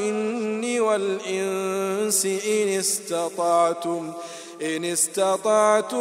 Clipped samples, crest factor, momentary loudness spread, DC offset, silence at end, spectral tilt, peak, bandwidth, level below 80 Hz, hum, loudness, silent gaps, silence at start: under 0.1%; 18 dB; 9 LU; under 0.1%; 0 s; -3 dB/octave; -6 dBFS; 16 kHz; -82 dBFS; none; -23 LUFS; none; 0 s